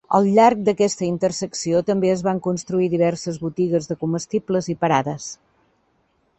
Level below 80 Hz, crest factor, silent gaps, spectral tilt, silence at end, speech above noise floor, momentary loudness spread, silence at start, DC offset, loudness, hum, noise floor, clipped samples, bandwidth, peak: -58 dBFS; 18 dB; none; -5.5 dB/octave; 1.05 s; 45 dB; 11 LU; 0.1 s; under 0.1%; -20 LUFS; none; -65 dBFS; under 0.1%; 8.4 kHz; -2 dBFS